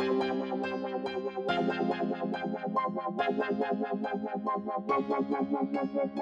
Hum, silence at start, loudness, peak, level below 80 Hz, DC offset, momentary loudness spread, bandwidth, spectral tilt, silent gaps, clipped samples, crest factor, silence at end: none; 0 s; -32 LUFS; -16 dBFS; -74 dBFS; under 0.1%; 4 LU; 7.8 kHz; -7.5 dB/octave; none; under 0.1%; 14 dB; 0 s